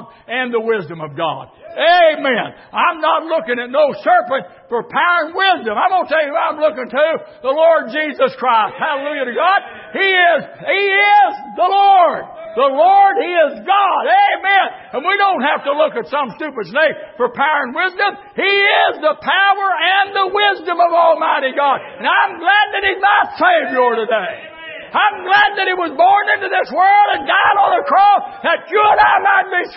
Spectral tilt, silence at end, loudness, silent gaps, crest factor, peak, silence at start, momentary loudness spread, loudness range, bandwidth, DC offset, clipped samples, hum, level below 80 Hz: -8 dB/octave; 0 s; -14 LUFS; none; 14 dB; 0 dBFS; 0 s; 10 LU; 4 LU; 5.8 kHz; under 0.1%; under 0.1%; none; -60 dBFS